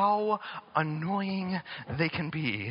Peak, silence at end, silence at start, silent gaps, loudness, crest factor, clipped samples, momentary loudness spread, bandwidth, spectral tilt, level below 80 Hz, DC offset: -12 dBFS; 0 s; 0 s; none; -31 LUFS; 18 dB; under 0.1%; 5 LU; 5.4 kHz; -4.5 dB/octave; -64 dBFS; under 0.1%